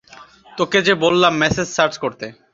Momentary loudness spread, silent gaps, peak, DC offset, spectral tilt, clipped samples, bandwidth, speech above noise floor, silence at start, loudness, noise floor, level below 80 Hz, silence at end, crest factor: 12 LU; none; -2 dBFS; under 0.1%; -4 dB/octave; under 0.1%; 7.8 kHz; 27 dB; 0.15 s; -17 LUFS; -44 dBFS; -48 dBFS; 0.2 s; 18 dB